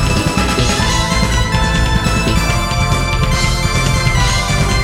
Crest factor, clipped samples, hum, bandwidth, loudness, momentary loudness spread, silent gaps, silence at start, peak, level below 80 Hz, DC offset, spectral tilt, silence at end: 12 dB; under 0.1%; none; 16.5 kHz; -14 LUFS; 2 LU; none; 0 s; 0 dBFS; -18 dBFS; under 0.1%; -4 dB/octave; 0 s